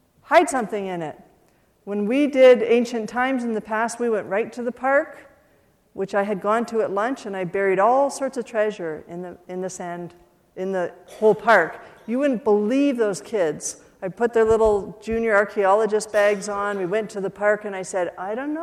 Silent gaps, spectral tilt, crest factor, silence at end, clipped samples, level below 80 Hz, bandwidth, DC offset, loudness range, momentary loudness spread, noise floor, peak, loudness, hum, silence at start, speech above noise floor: none; -5 dB/octave; 18 dB; 0 s; under 0.1%; -54 dBFS; 14 kHz; under 0.1%; 4 LU; 14 LU; -60 dBFS; -4 dBFS; -22 LUFS; none; 0.3 s; 39 dB